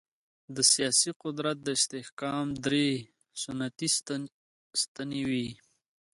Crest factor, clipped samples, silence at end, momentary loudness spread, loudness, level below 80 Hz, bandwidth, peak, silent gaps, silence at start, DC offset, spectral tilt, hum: 22 dB; under 0.1%; 0.6 s; 14 LU; -29 LUFS; -68 dBFS; 12 kHz; -10 dBFS; 1.16-1.20 s, 2.12-2.17 s, 4.32-4.71 s, 4.88-4.95 s; 0.5 s; under 0.1%; -2.5 dB/octave; none